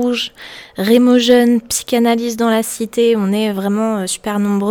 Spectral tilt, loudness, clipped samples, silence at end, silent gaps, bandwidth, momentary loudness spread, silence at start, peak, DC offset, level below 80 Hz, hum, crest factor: -4.5 dB/octave; -15 LUFS; under 0.1%; 0 s; none; 18 kHz; 10 LU; 0 s; -2 dBFS; under 0.1%; -54 dBFS; none; 14 dB